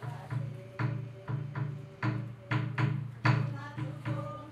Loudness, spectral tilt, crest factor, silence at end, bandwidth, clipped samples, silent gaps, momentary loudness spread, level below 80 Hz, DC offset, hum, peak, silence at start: -35 LUFS; -8 dB/octave; 22 dB; 0 s; 7.4 kHz; under 0.1%; none; 9 LU; -66 dBFS; under 0.1%; none; -12 dBFS; 0 s